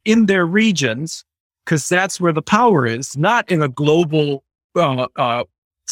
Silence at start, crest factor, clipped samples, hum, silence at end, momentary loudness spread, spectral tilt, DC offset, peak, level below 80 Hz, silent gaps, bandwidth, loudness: 0.05 s; 18 dB; under 0.1%; none; 0 s; 13 LU; -5 dB/octave; under 0.1%; 0 dBFS; -60 dBFS; 1.40-1.50 s, 4.64-4.70 s, 5.58-5.71 s; 15.5 kHz; -17 LUFS